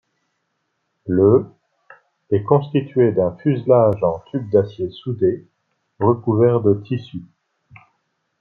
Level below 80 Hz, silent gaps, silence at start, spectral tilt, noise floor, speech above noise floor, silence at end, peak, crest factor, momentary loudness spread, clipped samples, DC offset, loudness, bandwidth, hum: -58 dBFS; none; 1.05 s; -11 dB/octave; -72 dBFS; 55 dB; 1.15 s; -2 dBFS; 18 dB; 12 LU; under 0.1%; under 0.1%; -18 LUFS; 4.5 kHz; none